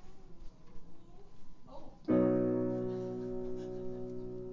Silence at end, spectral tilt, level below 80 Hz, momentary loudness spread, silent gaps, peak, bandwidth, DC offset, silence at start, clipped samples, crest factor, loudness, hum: 0 s; -10 dB/octave; -56 dBFS; 18 LU; none; -18 dBFS; 7.2 kHz; under 0.1%; 0 s; under 0.1%; 18 dB; -35 LUFS; none